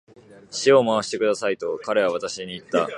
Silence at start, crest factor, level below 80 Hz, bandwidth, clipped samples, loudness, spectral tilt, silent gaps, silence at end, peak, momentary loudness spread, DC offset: 0.3 s; 18 dB; -66 dBFS; 11 kHz; under 0.1%; -22 LUFS; -4 dB/octave; none; 0 s; -4 dBFS; 12 LU; under 0.1%